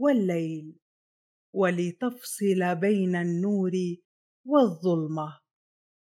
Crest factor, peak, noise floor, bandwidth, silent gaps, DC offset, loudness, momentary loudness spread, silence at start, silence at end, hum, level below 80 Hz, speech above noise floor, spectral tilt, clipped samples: 18 dB; -8 dBFS; under -90 dBFS; 16 kHz; 0.82-1.53 s, 4.05-4.44 s; under 0.1%; -27 LUFS; 12 LU; 0 s; 0.7 s; none; -84 dBFS; over 64 dB; -7 dB/octave; under 0.1%